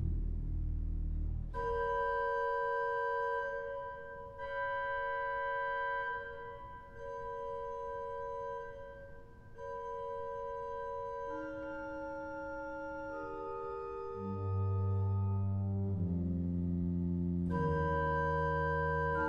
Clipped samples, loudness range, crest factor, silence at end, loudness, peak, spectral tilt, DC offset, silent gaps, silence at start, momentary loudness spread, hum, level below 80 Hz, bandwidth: under 0.1%; 8 LU; 14 dB; 0 s; -37 LUFS; -22 dBFS; -9 dB/octave; under 0.1%; none; 0 s; 12 LU; none; -48 dBFS; 6.6 kHz